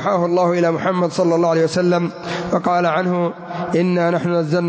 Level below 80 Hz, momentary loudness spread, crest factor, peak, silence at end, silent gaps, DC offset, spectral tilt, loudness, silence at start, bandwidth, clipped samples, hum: -56 dBFS; 5 LU; 12 dB; -6 dBFS; 0 s; none; under 0.1%; -7 dB/octave; -18 LUFS; 0 s; 8 kHz; under 0.1%; none